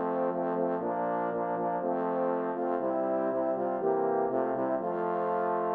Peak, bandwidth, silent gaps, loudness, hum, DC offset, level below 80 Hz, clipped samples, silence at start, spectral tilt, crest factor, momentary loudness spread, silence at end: -16 dBFS; 4.3 kHz; none; -30 LUFS; none; under 0.1%; -80 dBFS; under 0.1%; 0 s; -10.5 dB/octave; 14 dB; 2 LU; 0 s